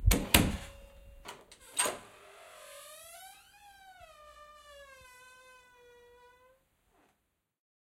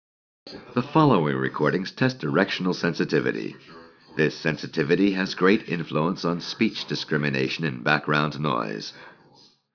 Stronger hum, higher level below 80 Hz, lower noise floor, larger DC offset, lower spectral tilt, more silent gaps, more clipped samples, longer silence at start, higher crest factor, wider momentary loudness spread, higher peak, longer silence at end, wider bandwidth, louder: neither; first, -42 dBFS vs -62 dBFS; first, -80 dBFS vs -56 dBFS; neither; second, -3 dB/octave vs -6.5 dB/octave; neither; neither; second, 0 s vs 0.45 s; first, 34 dB vs 20 dB; first, 29 LU vs 10 LU; about the same, -2 dBFS vs -4 dBFS; first, 3.15 s vs 0.65 s; first, 16 kHz vs 5.4 kHz; second, -29 LUFS vs -24 LUFS